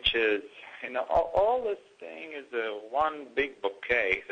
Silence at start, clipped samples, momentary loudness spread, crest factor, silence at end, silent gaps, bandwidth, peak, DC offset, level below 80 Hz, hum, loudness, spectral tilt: 0 s; under 0.1%; 15 LU; 20 dB; 0 s; none; 9.2 kHz; -10 dBFS; under 0.1%; -54 dBFS; none; -29 LUFS; -4.5 dB/octave